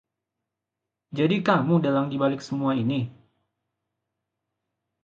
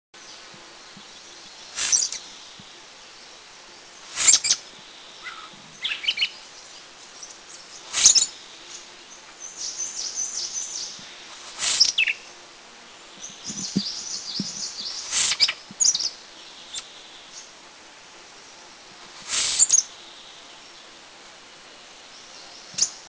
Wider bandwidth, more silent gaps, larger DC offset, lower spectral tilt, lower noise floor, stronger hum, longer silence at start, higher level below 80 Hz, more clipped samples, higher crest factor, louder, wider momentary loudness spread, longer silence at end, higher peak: about the same, 7.4 kHz vs 8 kHz; neither; neither; first, -7.5 dB/octave vs 1 dB/octave; first, -86 dBFS vs -46 dBFS; neither; first, 1.1 s vs 0.15 s; about the same, -68 dBFS vs -66 dBFS; neither; second, 20 dB vs 28 dB; second, -24 LUFS vs -21 LUFS; second, 8 LU vs 26 LU; first, 1.95 s vs 0 s; second, -6 dBFS vs 0 dBFS